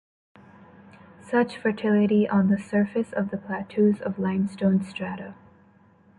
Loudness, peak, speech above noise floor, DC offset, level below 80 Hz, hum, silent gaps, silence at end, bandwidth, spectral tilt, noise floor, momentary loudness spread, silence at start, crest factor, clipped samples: -24 LUFS; -10 dBFS; 33 dB; under 0.1%; -62 dBFS; none; none; 0.85 s; 10 kHz; -8.5 dB/octave; -57 dBFS; 11 LU; 1.25 s; 14 dB; under 0.1%